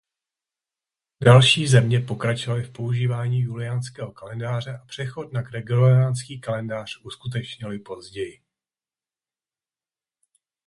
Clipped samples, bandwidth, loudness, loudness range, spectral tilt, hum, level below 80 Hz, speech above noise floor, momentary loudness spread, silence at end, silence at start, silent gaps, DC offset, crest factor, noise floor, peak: under 0.1%; 11.5 kHz; -22 LUFS; 16 LU; -5.5 dB/octave; none; -56 dBFS; over 68 dB; 19 LU; 2.35 s; 1.2 s; none; under 0.1%; 22 dB; under -90 dBFS; -2 dBFS